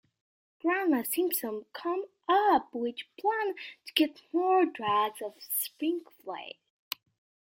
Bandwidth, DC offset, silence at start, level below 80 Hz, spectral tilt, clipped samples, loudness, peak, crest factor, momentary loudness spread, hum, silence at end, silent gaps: 16.5 kHz; under 0.1%; 0.65 s; -78 dBFS; -2.5 dB/octave; under 0.1%; -30 LUFS; -10 dBFS; 22 dB; 15 LU; none; 1 s; none